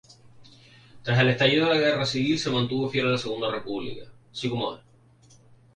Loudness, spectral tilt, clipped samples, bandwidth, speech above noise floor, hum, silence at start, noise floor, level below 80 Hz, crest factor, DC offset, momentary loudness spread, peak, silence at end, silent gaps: -24 LUFS; -5.5 dB/octave; under 0.1%; 10 kHz; 31 dB; none; 0.4 s; -56 dBFS; -60 dBFS; 18 dB; under 0.1%; 17 LU; -8 dBFS; 1 s; none